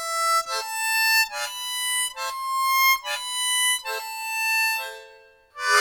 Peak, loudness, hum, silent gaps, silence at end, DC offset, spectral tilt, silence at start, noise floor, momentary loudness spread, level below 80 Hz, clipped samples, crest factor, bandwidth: -6 dBFS; -22 LUFS; none; none; 0 s; under 0.1%; 4.5 dB/octave; 0 s; -51 dBFS; 10 LU; -70 dBFS; under 0.1%; 20 dB; 19.5 kHz